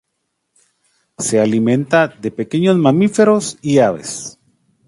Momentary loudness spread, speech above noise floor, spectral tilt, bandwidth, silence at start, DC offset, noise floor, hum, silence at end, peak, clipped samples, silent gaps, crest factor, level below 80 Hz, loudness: 12 LU; 58 dB; -5.5 dB/octave; 11.5 kHz; 1.2 s; under 0.1%; -72 dBFS; none; 0.55 s; 0 dBFS; under 0.1%; none; 16 dB; -58 dBFS; -15 LUFS